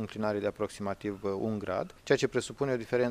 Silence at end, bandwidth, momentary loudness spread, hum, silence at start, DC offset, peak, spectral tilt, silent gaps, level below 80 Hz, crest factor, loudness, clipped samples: 0 s; 14.5 kHz; 7 LU; none; 0 s; under 0.1%; -10 dBFS; -5.5 dB/octave; none; -60 dBFS; 20 dB; -32 LUFS; under 0.1%